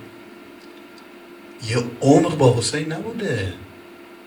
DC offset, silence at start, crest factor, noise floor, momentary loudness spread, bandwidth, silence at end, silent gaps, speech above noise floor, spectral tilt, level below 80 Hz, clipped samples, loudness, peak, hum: under 0.1%; 0 s; 22 dB; -42 dBFS; 26 LU; 20 kHz; 0.05 s; none; 23 dB; -5.5 dB/octave; -56 dBFS; under 0.1%; -20 LUFS; -2 dBFS; none